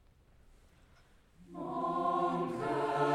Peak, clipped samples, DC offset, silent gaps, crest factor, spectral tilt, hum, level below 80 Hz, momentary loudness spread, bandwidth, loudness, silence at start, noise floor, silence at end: -18 dBFS; under 0.1%; under 0.1%; none; 18 dB; -7 dB/octave; none; -66 dBFS; 11 LU; 12.5 kHz; -34 LUFS; 1.4 s; -63 dBFS; 0 s